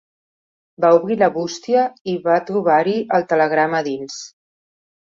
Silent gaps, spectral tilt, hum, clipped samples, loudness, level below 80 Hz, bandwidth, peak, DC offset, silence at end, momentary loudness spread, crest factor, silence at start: 2.01-2.05 s; -5.5 dB/octave; none; under 0.1%; -18 LUFS; -66 dBFS; 7.6 kHz; -2 dBFS; under 0.1%; 0.75 s; 11 LU; 16 dB; 0.8 s